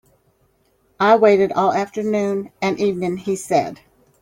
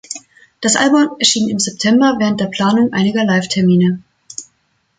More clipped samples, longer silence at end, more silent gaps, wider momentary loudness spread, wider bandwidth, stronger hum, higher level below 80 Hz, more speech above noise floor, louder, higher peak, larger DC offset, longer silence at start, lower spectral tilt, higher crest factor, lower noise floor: neither; about the same, 0.45 s vs 0.55 s; neither; second, 10 LU vs 18 LU; first, 16 kHz vs 9.6 kHz; neither; about the same, -60 dBFS vs -56 dBFS; second, 44 dB vs 49 dB; second, -18 LUFS vs -14 LUFS; about the same, -2 dBFS vs 0 dBFS; neither; first, 1 s vs 0.1 s; first, -5.5 dB/octave vs -4 dB/octave; about the same, 18 dB vs 14 dB; about the same, -62 dBFS vs -62 dBFS